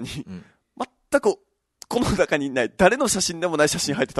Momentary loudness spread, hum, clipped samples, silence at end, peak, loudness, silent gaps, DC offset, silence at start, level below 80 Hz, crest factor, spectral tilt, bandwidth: 16 LU; none; under 0.1%; 0 s; -4 dBFS; -21 LUFS; none; under 0.1%; 0 s; -46 dBFS; 20 dB; -3.5 dB/octave; 12.5 kHz